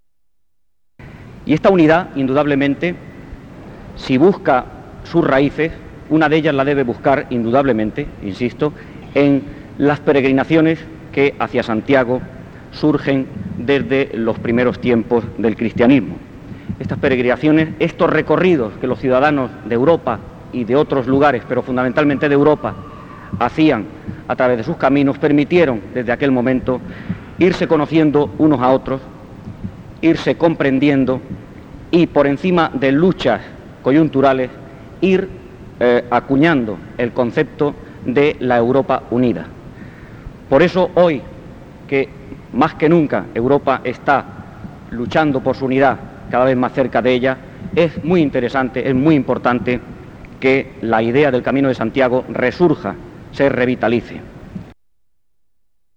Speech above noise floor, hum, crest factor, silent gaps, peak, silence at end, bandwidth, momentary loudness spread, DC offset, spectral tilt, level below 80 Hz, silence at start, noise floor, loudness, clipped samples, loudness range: 57 dB; none; 16 dB; none; 0 dBFS; 1.25 s; 7.8 kHz; 19 LU; under 0.1%; -8 dB/octave; -42 dBFS; 1 s; -72 dBFS; -16 LUFS; under 0.1%; 2 LU